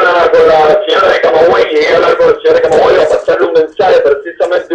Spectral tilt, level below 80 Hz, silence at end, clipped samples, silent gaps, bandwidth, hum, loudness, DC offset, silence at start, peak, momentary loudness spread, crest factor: -4.5 dB/octave; -42 dBFS; 0 s; under 0.1%; none; 8.8 kHz; none; -8 LUFS; under 0.1%; 0 s; 0 dBFS; 4 LU; 8 dB